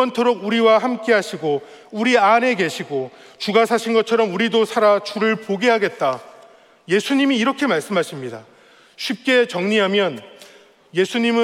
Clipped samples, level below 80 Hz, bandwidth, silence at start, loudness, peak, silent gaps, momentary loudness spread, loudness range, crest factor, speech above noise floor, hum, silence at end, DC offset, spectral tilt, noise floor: under 0.1%; -74 dBFS; 14.5 kHz; 0 s; -18 LUFS; -2 dBFS; none; 12 LU; 3 LU; 16 dB; 30 dB; none; 0 s; under 0.1%; -4.5 dB/octave; -48 dBFS